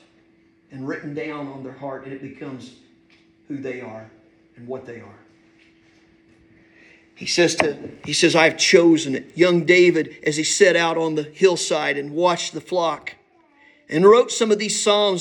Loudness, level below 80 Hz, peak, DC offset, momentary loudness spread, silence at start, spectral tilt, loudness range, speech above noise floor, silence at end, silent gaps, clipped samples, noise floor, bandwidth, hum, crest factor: -18 LUFS; -66 dBFS; -2 dBFS; under 0.1%; 20 LU; 0.75 s; -3.5 dB/octave; 20 LU; 38 dB; 0 s; none; under 0.1%; -57 dBFS; 12 kHz; none; 20 dB